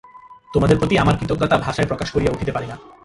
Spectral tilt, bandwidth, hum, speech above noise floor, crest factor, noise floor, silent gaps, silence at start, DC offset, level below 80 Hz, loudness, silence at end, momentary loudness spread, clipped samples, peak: -6.5 dB/octave; 11.5 kHz; none; 24 dB; 18 dB; -42 dBFS; none; 0.15 s; under 0.1%; -36 dBFS; -19 LUFS; 0.15 s; 9 LU; under 0.1%; -2 dBFS